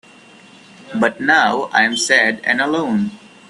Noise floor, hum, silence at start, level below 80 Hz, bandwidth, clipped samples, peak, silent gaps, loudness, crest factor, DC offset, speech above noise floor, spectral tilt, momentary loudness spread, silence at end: -44 dBFS; none; 0.85 s; -62 dBFS; 12.5 kHz; under 0.1%; 0 dBFS; none; -15 LUFS; 18 dB; under 0.1%; 28 dB; -3 dB/octave; 8 LU; 0.35 s